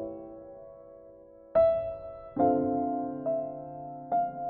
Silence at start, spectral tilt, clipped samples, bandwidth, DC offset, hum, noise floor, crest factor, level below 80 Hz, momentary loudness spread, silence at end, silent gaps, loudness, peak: 0 s; -8.5 dB/octave; under 0.1%; 4.3 kHz; under 0.1%; none; -52 dBFS; 18 dB; -60 dBFS; 22 LU; 0 s; none; -29 LUFS; -14 dBFS